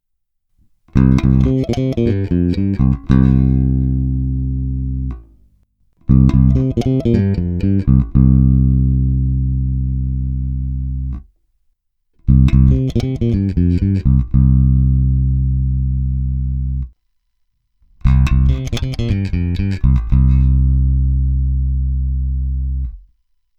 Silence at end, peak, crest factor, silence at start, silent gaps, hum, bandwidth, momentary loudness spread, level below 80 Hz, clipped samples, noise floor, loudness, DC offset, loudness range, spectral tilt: 0.6 s; 0 dBFS; 14 dB; 0.95 s; none; none; 6.6 kHz; 9 LU; -18 dBFS; under 0.1%; -69 dBFS; -16 LUFS; under 0.1%; 5 LU; -9.5 dB/octave